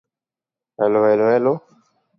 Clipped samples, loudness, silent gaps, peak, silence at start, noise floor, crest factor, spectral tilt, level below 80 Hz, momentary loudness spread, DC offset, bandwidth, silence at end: under 0.1%; -18 LUFS; none; -4 dBFS; 0.8 s; -89 dBFS; 16 dB; -9.5 dB/octave; -70 dBFS; 7 LU; under 0.1%; 5.8 kHz; 0.6 s